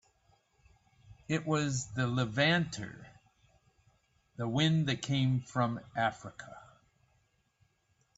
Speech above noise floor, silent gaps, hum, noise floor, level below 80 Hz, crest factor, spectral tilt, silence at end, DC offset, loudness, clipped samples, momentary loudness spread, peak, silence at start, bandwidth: 42 dB; none; none; -74 dBFS; -66 dBFS; 20 dB; -5 dB/octave; 1.55 s; under 0.1%; -32 LUFS; under 0.1%; 19 LU; -16 dBFS; 1.1 s; 8 kHz